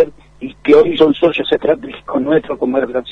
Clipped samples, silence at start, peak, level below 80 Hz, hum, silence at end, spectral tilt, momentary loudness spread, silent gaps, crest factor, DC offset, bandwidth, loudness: under 0.1%; 0 s; 0 dBFS; -46 dBFS; none; 0 s; -7 dB/octave; 11 LU; none; 14 dB; under 0.1%; 6.2 kHz; -14 LUFS